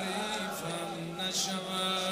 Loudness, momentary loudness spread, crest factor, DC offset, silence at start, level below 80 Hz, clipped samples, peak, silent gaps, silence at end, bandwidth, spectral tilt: -33 LUFS; 6 LU; 14 dB; under 0.1%; 0 s; -68 dBFS; under 0.1%; -20 dBFS; none; 0 s; 16 kHz; -2.5 dB/octave